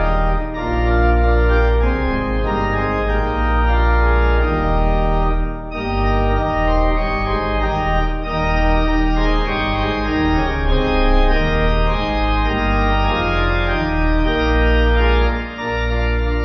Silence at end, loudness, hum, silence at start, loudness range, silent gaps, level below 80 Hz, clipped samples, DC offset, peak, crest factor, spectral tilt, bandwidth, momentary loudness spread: 0 s; -18 LUFS; none; 0 s; 1 LU; none; -18 dBFS; under 0.1%; under 0.1%; -2 dBFS; 12 dB; -8 dB/octave; 6 kHz; 5 LU